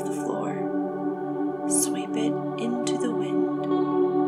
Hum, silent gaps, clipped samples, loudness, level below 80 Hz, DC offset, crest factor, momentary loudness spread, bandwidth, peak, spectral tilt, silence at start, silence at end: none; none; under 0.1%; -26 LUFS; -76 dBFS; under 0.1%; 14 dB; 6 LU; 14.5 kHz; -10 dBFS; -5 dB/octave; 0 s; 0 s